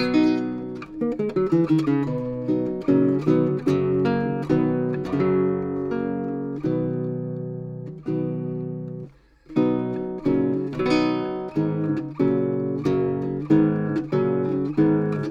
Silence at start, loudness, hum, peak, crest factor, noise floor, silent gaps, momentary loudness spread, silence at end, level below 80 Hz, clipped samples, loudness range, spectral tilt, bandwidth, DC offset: 0 s; -23 LUFS; none; -6 dBFS; 18 dB; -45 dBFS; none; 10 LU; 0 s; -54 dBFS; under 0.1%; 6 LU; -9 dB/octave; 7.4 kHz; under 0.1%